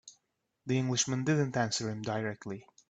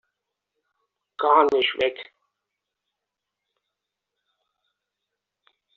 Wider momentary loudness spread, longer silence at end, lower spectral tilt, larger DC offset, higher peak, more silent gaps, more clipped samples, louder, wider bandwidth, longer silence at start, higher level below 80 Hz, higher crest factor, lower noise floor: first, 13 LU vs 9 LU; second, 0.25 s vs 3.75 s; first, -4.5 dB/octave vs 1 dB/octave; neither; second, -16 dBFS vs -4 dBFS; neither; neither; second, -32 LUFS vs -21 LUFS; first, 9.2 kHz vs 7.2 kHz; second, 0.05 s vs 1.2 s; about the same, -70 dBFS vs -72 dBFS; second, 18 dB vs 24 dB; about the same, -81 dBFS vs -84 dBFS